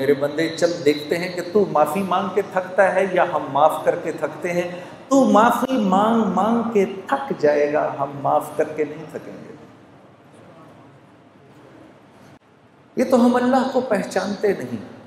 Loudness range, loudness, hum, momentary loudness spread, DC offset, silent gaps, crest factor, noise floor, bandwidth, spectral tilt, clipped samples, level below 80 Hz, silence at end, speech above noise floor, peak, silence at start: 9 LU; -20 LUFS; none; 10 LU; under 0.1%; none; 20 dB; -52 dBFS; 16 kHz; -6 dB/octave; under 0.1%; -66 dBFS; 0.05 s; 32 dB; 0 dBFS; 0 s